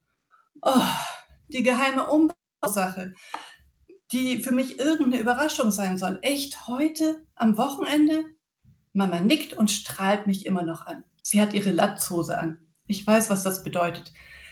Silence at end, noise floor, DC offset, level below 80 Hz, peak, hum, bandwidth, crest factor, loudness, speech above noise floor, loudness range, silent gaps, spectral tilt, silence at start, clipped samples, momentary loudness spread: 0 s; -64 dBFS; under 0.1%; -64 dBFS; -8 dBFS; none; over 20 kHz; 18 dB; -25 LUFS; 40 dB; 2 LU; none; -4.5 dB/octave; 0.65 s; under 0.1%; 12 LU